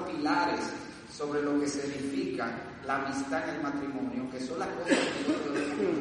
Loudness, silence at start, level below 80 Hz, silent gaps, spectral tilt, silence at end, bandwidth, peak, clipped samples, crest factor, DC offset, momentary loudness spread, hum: -32 LUFS; 0 s; -64 dBFS; none; -4.5 dB/octave; 0 s; 10.5 kHz; -12 dBFS; under 0.1%; 20 dB; under 0.1%; 8 LU; none